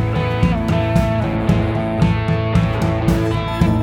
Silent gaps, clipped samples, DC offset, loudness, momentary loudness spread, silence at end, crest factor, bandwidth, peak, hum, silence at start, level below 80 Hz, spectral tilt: none; under 0.1%; under 0.1%; -18 LUFS; 2 LU; 0 s; 14 dB; 14 kHz; -2 dBFS; none; 0 s; -28 dBFS; -7.5 dB/octave